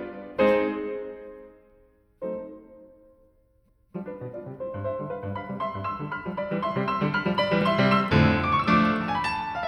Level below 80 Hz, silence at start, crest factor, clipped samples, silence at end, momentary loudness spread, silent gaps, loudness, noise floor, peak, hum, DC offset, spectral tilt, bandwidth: -50 dBFS; 0 s; 20 dB; under 0.1%; 0 s; 17 LU; none; -26 LUFS; -64 dBFS; -6 dBFS; none; under 0.1%; -7.5 dB/octave; 10.5 kHz